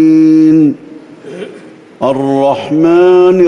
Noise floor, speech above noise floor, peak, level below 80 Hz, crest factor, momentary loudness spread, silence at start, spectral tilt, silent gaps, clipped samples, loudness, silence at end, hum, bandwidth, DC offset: -34 dBFS; 26 dB; 0 dBFS; -54 dBFS; 8 dB; 20 LU; 0 s; -8 dB/octave; none; under 0.1%; -9 LUFS; 0 s; none; 6.8 kHz; under 0.1%